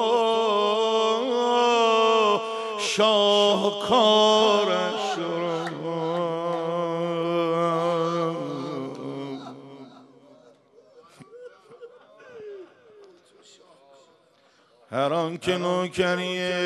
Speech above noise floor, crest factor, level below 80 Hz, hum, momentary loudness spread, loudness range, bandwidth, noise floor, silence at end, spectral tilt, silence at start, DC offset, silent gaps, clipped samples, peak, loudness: 39 dB; 18 dB; -68 dBFS; none; 15 LU; 16 LU; 12 kHz; -60 dBFS; 0 s; -4 dB/octave; 0 s; under 0.1%; none; under 0.1%; -6 dBFS; -23 LUFS